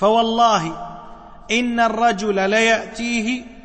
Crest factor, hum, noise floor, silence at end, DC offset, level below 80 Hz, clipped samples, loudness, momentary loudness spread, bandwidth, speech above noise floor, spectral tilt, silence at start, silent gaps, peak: 14 dB; none; -39 dBFS; 0.05 s; under 0.1%; -46 dBFS; under 0.1%; -18 LUFS; 13 LU; 8.8 kHz; 21 dB; -3.5 dB/octave; 0 s; none; -4 dBFS